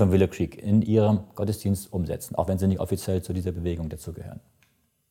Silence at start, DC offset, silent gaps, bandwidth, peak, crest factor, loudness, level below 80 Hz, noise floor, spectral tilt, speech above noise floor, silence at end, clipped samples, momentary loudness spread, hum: 0 s; under 0.1%; none; 16.5 kHz; -6 dBFS; 18 dB; -26 LUFS; -46 dBFS; -67 dBFS; -7.5 dB/octave; 42 dB; 0.7 s; under 0.1%; 15 LU; none